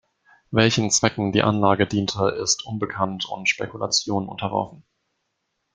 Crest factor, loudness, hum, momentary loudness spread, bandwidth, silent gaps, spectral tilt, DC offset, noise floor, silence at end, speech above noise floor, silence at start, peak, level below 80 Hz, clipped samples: 22 dB; -22 LUFS; none; 8 LU; 10 kHz; none; -3.5 dB/octave; under 0.1%; -76 dBFS; 0.95 s; 54 dB; 0.5 s; -2 dBFS; -56 dBFS; under 0.1%